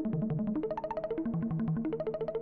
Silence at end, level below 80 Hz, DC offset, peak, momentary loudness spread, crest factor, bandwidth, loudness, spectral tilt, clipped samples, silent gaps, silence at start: 0 s; -56 dBFS; under 0.1%; -24 dBFS; 3 LU; 8 dB; 4.7 kHz; -34 LUFS; -11.5 dB/octave; under 0.1%; none; 0 s